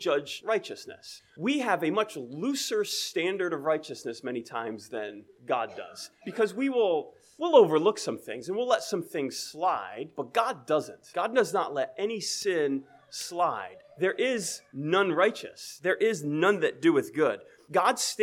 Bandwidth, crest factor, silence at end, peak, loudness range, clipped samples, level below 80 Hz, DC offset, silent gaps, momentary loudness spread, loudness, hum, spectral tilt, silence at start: 16.5 kHz; 22 dB; 0 s; -6 dBFS; 5 LU; under 0.1%; -80 dBFS; under 0.1%; none; 13 LU; -28 LUFS; none; -3.5 dB/octave; 0 s